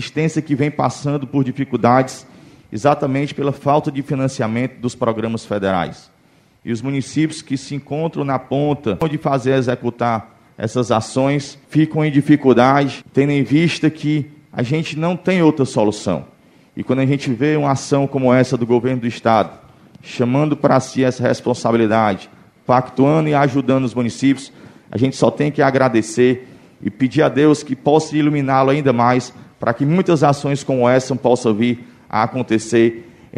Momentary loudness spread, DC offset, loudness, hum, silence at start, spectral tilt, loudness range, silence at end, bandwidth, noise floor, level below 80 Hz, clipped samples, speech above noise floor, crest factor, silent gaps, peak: 9 LU; under 0.1%; -17 LUFS; none; 0 s; -6.5 dB/octave; 5 LU; 0 s; 11.5 kHz; -53 dBFS; -54 dBFS; under 0.1%; 37 dB; 16 dB; none; 0 dBFS